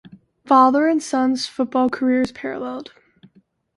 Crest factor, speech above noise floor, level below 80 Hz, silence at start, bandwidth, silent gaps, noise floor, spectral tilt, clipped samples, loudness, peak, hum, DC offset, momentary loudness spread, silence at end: 18 dB; 39 dB; -60 dBFS; 0.45 s; 11.5 kHz; none; -57 dBFS; -4 dB/octave; under 0.1%; -19 LUFS; -2 dBFS; none; under 0.1%; 14 LU; 0.95 s